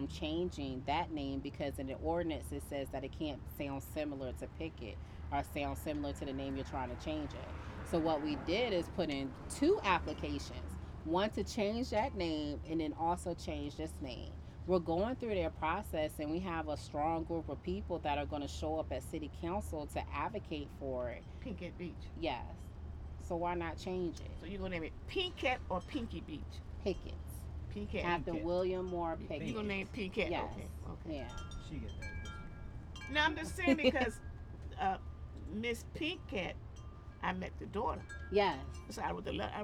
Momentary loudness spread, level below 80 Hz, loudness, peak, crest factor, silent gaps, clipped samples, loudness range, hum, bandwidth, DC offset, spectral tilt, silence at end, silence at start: 12 LU; -50 dBFS; -39 LUFS; -16 dBFS; 22 dB; none; under 0.1%; 6 LU; none; 16 kHz; under 0.1%; -5.5 dB/octave; 0 s; 0 s